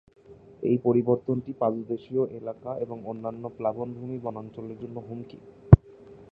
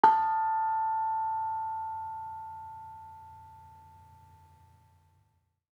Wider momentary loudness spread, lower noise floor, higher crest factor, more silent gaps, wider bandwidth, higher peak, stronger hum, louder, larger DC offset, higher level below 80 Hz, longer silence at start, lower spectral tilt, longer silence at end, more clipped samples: second, 20 LU vs 23 LU; second, -49 dBFS vs -73 dBFS; about the same, 26 dB vs 26 dB; neither; second, 3.8 kHz vs 5.8 kHz; first, 0 dBFS vs -8 dBFS; neither; first, -26 LUFS vs -31 LUFS; neither; first, -40 dBFS vs -76 dBFS; first, 0.3 s vs 0.05 s; first, -12.5 dB/octave vs -5.5 dB/octave; second, 0.1 s vs 1.75 s; neither